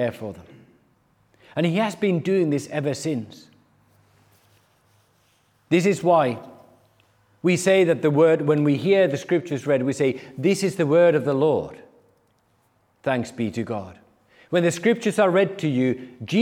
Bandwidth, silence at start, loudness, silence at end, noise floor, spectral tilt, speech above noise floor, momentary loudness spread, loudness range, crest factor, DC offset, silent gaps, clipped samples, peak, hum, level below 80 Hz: 16 kHz; 0 s; -22 LUFS; 0 s; -64 dBFS; -6 dB/octave; 43 dB; 13 LU; 8 LU; 16 dB; under 0.1%; none; under 0.1%; -6 dBFS; none; -70 dBFS